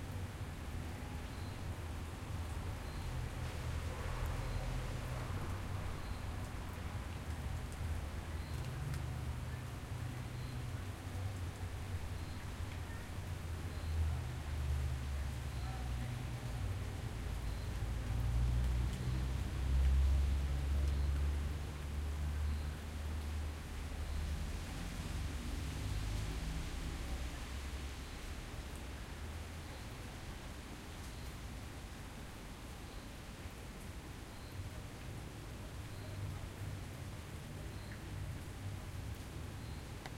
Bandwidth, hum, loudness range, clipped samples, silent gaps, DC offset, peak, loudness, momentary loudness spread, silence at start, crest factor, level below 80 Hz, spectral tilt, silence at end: 16 kHz; none; 11 LU; under 0.1%; none; under 0.1%; -24 dBFS; -43 LUFS; 10 LU; 0 s; 16 dB; -42 dBFS; -5.5 dB/octave; 0 s